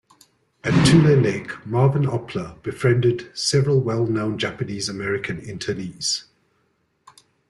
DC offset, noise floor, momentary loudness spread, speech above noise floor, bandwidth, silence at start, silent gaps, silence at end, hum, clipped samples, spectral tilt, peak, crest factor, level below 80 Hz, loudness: under 0.1%; -67 dBFS; 14 LU; 47 dB; 12 kHz; 0.65 s; none; 1.3 s; none; under 0.1%; -5.5 dB/octave; -4 dBFS; 18 dB; -50 dBFS; -21 LUFS